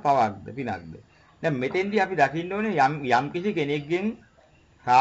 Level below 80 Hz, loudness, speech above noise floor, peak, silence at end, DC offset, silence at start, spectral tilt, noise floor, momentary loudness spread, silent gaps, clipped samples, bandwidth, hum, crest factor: -60 dBFS; -25 LUFS; 33 dB; -6 dBFS; 0 s; under 0.1%; 0.05 s; -6 dB/octave; -57 dBFS; 12 LU; none; under 0.1%; 8 kHz; none; 18 dB